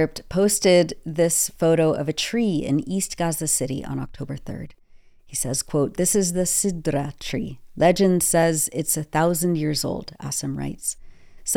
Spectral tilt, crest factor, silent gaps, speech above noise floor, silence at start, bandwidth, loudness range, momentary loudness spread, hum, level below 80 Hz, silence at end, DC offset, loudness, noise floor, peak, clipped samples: -4 dB/octave; 18 dB; none; 27 dB; 0 s; 18 kHz; 5 LU; 13 LU; none; -46 dBFS; 0 s; under 0.1%; -22 LUFS; -49 dBFS; -6 dBFS; under 0.1%